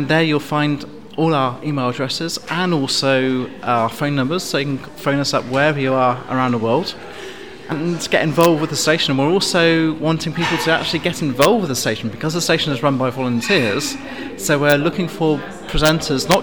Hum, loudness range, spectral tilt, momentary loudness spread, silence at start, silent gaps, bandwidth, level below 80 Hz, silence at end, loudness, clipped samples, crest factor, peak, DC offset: none; 3 LU; -4.5 dB/octave; 9 LU; 0 s; none; over 20 kHz; -40 dBFS; 0 s; -18 LUFS; under 0.1%; 18 dB; 0 dBFS; 0.8%